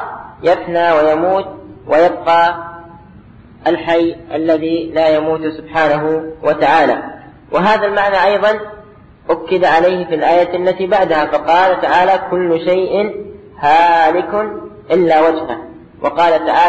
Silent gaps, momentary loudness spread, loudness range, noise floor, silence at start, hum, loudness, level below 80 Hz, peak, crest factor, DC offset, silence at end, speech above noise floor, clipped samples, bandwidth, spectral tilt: none; 10 LU; 3 LU; -40 dBFS; 0 s; none; -13 LUFS; -48 dBFS; -2 dBFS; 12 dB; 0.3%; 0 s; 27 dB; under 0.1%; 8.2 kHz; -6.5 dB/octave